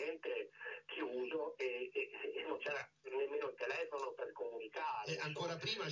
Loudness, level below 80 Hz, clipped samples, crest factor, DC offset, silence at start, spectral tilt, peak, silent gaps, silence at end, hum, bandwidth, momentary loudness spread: -43 LUFS; -86 dBFS; under 0.1%; 16 dB; under 0.1%; 0 s; -4 dB/octave; -28 dBFS; none; 0 s; none; 7.6 kHz; 5 LU